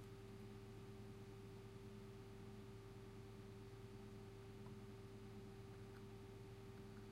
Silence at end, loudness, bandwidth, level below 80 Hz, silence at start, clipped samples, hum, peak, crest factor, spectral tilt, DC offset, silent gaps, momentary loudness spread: 0 s; -58 LUFS; 16 kHz; -68 dBFS; 0 s; under 0.1%; none; -44 dBFS; 12 dB; -6.5 dB/octave; under 0.1%; none; 1 LU